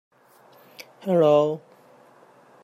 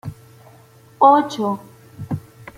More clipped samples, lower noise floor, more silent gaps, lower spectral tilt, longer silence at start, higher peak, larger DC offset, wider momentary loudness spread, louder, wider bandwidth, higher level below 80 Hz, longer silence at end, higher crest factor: neither; first, -55 dBFS vs -48 dBFS; neither; about the same, -7.5 dB/octave vs -6.5 dB/octave; first, 1.05 s vs 0.05 s; second, -8 dBFS vs -2 dBFS; neither; first, 27 LU vs 20 LU; second, -21 LUFS vs -18 LUFS; second, 14.5 kHz vs 16 kHz; second, -74 dBFS vs -58 dBFS; first, 1.05 s vs 0.4 s; about the same, 16 dB vs 18 dB